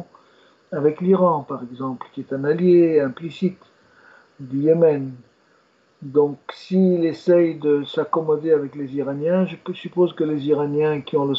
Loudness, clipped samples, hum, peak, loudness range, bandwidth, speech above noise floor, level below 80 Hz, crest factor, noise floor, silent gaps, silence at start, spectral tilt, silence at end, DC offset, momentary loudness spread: -20 LUFS; under 0.1%; none; -6 dBFS; 3 LU; 7.2 kHz; 40 dB; -70 dBFS; 16 dB; -59 dBFS; none; 0 s; -9 dB/octave; 0 s; under 0.1%; 13 LU